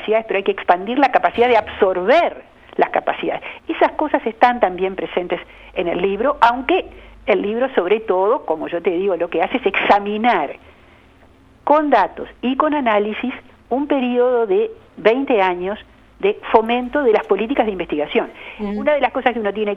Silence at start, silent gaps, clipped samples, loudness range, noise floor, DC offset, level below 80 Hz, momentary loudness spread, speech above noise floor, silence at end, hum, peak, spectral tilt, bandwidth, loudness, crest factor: 0 s; none; under 0.1%; 2 LU; -48 dBFS; under 0.1%; -50 dBFS; 11 LU; 31 dB; 0 s; none; 0 dBFS; -6.5 dB/octave; 7.2 kHz; -18 LUFS; 18 dB